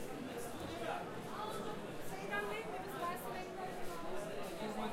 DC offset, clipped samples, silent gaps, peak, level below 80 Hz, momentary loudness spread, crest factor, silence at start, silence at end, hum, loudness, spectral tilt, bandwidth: under 0.1%; under 0.1%; none; -26 dBFS; -60 dBFS; 5 LU; 16 dB; 0 s; 0 s; none; -44 LUFS; -4.5 dB/octave; 16 kHz